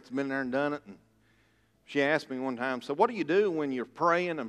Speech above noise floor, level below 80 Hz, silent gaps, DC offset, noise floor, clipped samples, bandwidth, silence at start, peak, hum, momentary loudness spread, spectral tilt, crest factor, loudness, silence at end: 38 dB; -76 dBFS; none; under 0.1%; -68 dBFS; under 0.1%; 11.5 kHz; 0.1 s; -10 dBFS; none; 7 LU; -6 dB/octave; 20 dB; -30 LUFS; 0 s